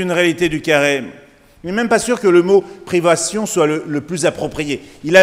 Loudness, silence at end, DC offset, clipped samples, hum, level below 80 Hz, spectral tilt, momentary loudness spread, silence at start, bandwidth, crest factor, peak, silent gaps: -16 LUFS; 0 s; under 0.1%; under 0.1%; none; -48 dBFS; -4 dB/octave; 10 LU; 0 s; 16 kHz; 16 dB; 0 dBFS; none